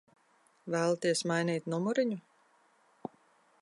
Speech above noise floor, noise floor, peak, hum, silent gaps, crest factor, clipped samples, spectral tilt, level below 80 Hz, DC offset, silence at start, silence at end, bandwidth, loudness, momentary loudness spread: 37 dB; -68 dBFS; -18 dBFS; none; none; 18 dB; under 0.1%; -5 dB/octave; -86 dBFS; under 0.1%; 0.65 s; 1.4 s; 11.5 kHz; -32 LUFS; 18 LU